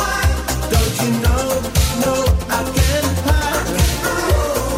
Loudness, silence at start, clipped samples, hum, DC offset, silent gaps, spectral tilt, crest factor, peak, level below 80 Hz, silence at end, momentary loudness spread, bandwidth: -17 LUFS; 0 s; under 0.1%; none; under 0.1%; none; -4.5 dB/octave; 14 dB; -2 dBFS; -22 dBFS; 0 s; 2 LU; 16.5 kHz